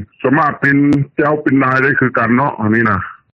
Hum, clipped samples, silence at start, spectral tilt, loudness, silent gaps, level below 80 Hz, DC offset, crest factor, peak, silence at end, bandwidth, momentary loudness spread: none; under 0.1%; 0 s; -9 dB/octave; -13 LUFS; none; -50 dBFS; under 0.1%; 14 dB; 0 dBFS; 0.2 s; 6.4 kHz; 4 LU